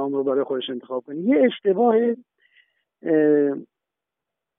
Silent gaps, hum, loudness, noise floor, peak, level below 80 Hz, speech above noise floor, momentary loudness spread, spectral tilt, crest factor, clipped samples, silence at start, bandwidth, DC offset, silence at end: none; none; -21 LUFS; -85 dBFS; -6 dBFS; under -90 dBFS; 65 dB; 12 LU; -4.5 dB/octave; 16 dB; under 0.1%; 0 s; 3.8 kHz; under 0.1%; 0.95 s